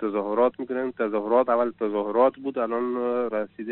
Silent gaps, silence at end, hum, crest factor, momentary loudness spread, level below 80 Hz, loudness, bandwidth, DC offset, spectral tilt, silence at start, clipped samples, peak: none; 0 s; none; 16 dB; 7 LU; -72 dBFS; -25 LUFS; 4.2 kHz; 0.1%; -5 dB/octave; 0 s; under 0.1%; -8 dBFS